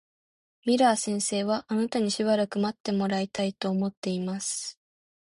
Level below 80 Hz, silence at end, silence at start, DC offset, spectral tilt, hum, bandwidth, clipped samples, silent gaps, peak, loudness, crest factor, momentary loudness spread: -68 dBFS; 0.7 s; 0.65 s; under 0.1%; -4.5 dB/octave; none; 11.5 kHz; under 0.1%; 2.80-2.84 s, 3.97-4.02 s; -10 dBFS; -27 LUFS; 18 dB; 8 LU